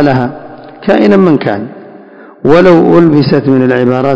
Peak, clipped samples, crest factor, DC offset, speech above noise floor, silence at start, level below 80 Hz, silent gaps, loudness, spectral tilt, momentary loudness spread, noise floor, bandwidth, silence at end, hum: 0 dBFS; 5%; 8 dB; under 0.1%; 27 dB; 0 s; -42 dBFS; none; -8 LUFS; -8.5 dB/octave; 14 LU; -33 dBFS; 8 kHz; 0 s; none